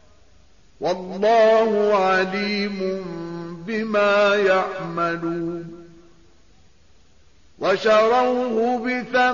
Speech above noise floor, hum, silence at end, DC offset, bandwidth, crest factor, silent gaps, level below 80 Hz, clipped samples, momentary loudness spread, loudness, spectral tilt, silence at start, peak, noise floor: 37 dB; none; 0 s; 0.3%; 7.2 kHz; 14 dB; none; -58 dBFS; under 0.1%; 13 LU; -20 LUFS; -3 dB/octave; 0.8 s; -8 dBFS; -56 dBFS